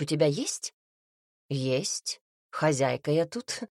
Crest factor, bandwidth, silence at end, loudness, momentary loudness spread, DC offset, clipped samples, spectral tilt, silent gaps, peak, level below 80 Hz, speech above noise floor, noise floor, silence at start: 18 dB; 13.5 kHz; 0.1 s; -29 LUFS; 11 LU; under 0.1%; under 0.1%; -4.5 dB/octave; 0.73-1.49 s, 2.21-2.50 s; -12 dBFS; -72 dBFS; over 62 dB; under -90 dBFS; 0 s